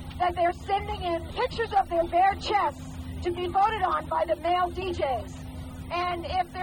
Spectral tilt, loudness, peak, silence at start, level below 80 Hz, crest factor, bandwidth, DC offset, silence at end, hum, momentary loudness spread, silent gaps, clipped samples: -5.5 dB/octave; -27 LUFS; -12 dBFS; 0 s; -44 dBFS; 14 dB; 18 kHz; under 0.1%; 0 s; none; 10 LU; none; under 0.1%